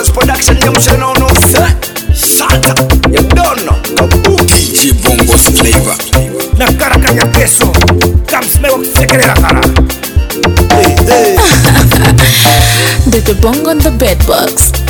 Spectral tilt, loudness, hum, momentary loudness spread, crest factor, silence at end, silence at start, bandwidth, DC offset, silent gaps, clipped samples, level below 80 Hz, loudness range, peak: -4 dB/octave; -7 LUFS; none; 5 LU; 6 dB; 0 s; 0 s; over 20 kHz; 0.5%; none; 2%; -14 dBFS; 2 LU; 0 dBFS